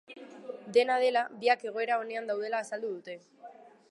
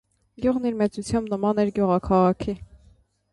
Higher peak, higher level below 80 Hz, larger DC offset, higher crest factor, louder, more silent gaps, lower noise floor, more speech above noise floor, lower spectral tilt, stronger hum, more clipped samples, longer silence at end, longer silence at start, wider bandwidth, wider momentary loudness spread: second, -12 dBFS vs -8 dBFS; second, under -90 dBFS vs -46 dBFS; neither; about the same, 20 dB vs 16 dB; second, -30 LUFS vs -23 LUFS; neither; second, -52 dBFS vs -58 dBFS; second, 22 dB vs 35 dB; second, -3 dB/octave vs -7.5 dB/octave; neither; neither; second, 0.2 s vs 0.7 s; second, 0.1 s vs 0.4 s; about the same, 11.5 kHz vs 11.5 kHz; first, 19 LU vs 8 LU